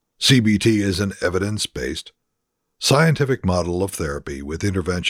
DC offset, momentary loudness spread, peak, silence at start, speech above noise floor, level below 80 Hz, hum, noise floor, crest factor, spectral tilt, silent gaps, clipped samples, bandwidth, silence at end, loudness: under 0.1%; 12 LU; -2 dBFS; 0.2 s; 56 dB; -42 dBFS; none; -76 dBFS; 18 dB; -5 dB/octave; none; under 0.1%; 16.5 kHz; 0 s; -20 LUFS